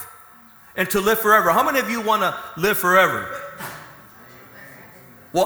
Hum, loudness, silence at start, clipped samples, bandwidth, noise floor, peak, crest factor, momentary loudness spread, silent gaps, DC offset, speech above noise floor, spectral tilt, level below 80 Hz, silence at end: none; -18 LUFS; 0 s; under 0.1%; over 20 kHz; -47 dBFS; 0 dBFS; 20 dB; 19 LU; none; under 0.1%; 29 dB; -3.5 dB/octave; -54 dBFS; 0 s